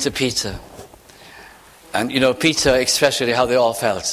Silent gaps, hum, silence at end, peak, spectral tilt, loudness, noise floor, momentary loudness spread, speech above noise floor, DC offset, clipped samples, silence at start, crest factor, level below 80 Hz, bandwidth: none; none; 0 s; -2 dBFS; -3 dB/octave; -18 LUFS; -44 dBFS; 9 LU; 26 dB; under 0.1%; under 0.1%; 0 s; 18 dB; -44 dBFS; 16 kHz